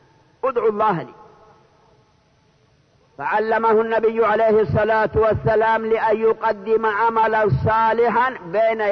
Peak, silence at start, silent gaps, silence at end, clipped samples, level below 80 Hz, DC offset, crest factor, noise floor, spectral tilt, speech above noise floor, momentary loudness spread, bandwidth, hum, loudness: -8 dBFS; 0.45 s; none; 0 s; under 0.1%; -46 dBFS; under 0.1%; 12 dB; -58 dBFS; -8.5 dB/octave; 40 dB; 5 LU; 6 kHz; none; -18 LUFS